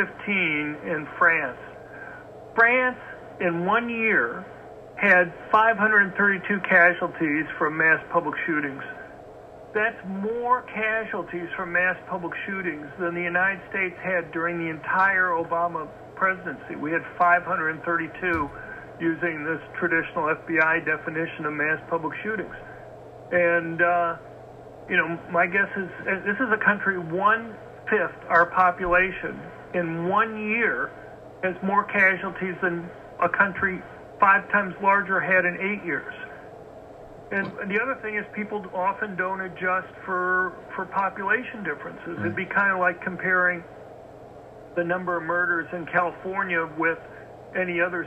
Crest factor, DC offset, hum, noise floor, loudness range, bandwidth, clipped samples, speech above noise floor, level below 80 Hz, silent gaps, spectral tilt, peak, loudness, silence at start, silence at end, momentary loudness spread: 20 dB; under 0.1%; none; -44 dBFS; 6 LU; 8.6 kHz; under 0.1%; 20 dB; -58 dBFS; none; -7.5 dB/octave; -4 dBFS; -24 LUFS; 0 s; 0 s; 19 LU